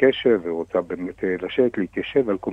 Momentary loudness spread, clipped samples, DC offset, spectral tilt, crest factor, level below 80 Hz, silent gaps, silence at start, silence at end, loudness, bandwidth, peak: 6 LU; under 0.1%; under 0.1%; -7.5 dB/octave; 18 dB; -56 dBFS; none; 0 s; 0 s; -23 LUFS; 4 kHz; -4 dBFS